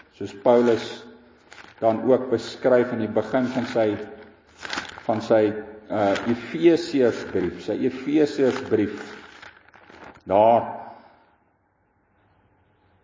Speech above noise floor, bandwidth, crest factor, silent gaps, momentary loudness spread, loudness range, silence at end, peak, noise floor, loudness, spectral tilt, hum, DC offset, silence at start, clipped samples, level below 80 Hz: 44 dB; 7.6 kHz; 18 dB; none; 18 LU; 4 LU; 2.1 s; -6 dBFS; -66 dBFS; -22 LUFS; -6.5 dB/octave; none; under 0.1%; 0.2 s; under 0.1%; -58 dBFS